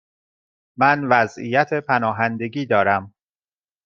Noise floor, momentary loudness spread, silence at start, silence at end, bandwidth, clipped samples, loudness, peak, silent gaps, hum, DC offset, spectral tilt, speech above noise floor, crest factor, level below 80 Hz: under -90 dBFS; 5 LU; 0.8 s; 0.75 s; 7.4 kHz; under 0.1%; -19 LUFS; -2 dBFS; none; none; under 0.1%; -6.5 dB/octave; over 71 dB; 20 dB; -66 dBFS